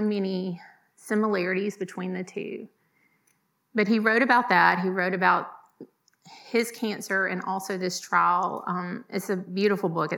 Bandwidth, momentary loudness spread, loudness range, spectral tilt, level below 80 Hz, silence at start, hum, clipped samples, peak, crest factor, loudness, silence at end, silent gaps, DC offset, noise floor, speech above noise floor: 18 kHz; 13 LU; 6 LU; -5 dB/octave; under -90 dBFS; 0 s; none; under 0.1%; -4 dBFS; 22 dB; -25 LUFS; 0 s; none; under 0.1%; -70 dBFS; 44 dB